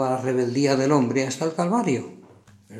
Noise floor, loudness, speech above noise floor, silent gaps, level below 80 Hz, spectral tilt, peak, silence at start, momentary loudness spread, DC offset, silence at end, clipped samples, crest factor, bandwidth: -51 dBFS; -23 LUFS; 29 dB; none; -74 dBFS; -6 dB/octave; -6 dBFS; 0 s; 6 LU; under 0.1%; 0 s; under 0.1%; 18 dB; 13.5 kHz